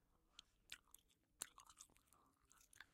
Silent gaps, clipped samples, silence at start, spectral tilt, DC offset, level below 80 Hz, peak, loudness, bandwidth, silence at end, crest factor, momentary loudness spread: none; under 0.1%; 0 s; 0.5 dB/octave; under 0.1%; -84 dBFS; -24 dBFS; -60 LUFS; 16 kHz; 0 s; 40 dB; 12 LU